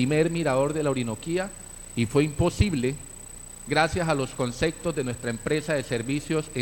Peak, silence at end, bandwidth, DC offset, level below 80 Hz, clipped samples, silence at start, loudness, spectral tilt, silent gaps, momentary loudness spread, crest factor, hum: -6 dBFS; 0 s; 17 kHz; under 0.1%; -42 dBFS; under 0.1%; 0 s; -26 LUFS; -5.5 dB/octave; none; 12 LU; 20 dB; none